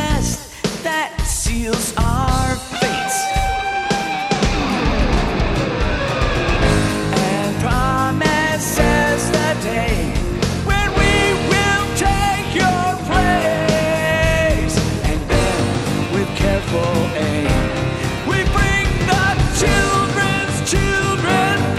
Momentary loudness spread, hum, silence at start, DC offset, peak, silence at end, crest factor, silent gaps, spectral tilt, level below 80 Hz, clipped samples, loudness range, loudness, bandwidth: 5 LU; none; 0 s; under 0.1%; -2 dBFS; 0 s; 16 dB; none; -4.5 dB/octave; -24 dBFS; under 0.1%; 2 LU; -17 LUFS; 15 kHz